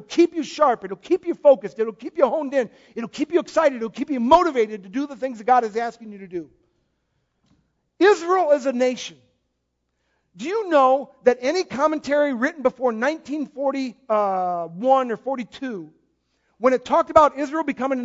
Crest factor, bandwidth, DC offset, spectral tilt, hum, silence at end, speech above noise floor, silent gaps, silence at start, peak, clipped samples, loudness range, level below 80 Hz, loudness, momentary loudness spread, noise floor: 22 dB; 7.8 kHz; under 0.1%; -4.5 dB/octave; none; 0 s; 54 dB; none; 0 s; 0 dBFS; under 0.1%; 3 LU; -58 dBFS; -21 LUFS; 14 LU; -75 dBFS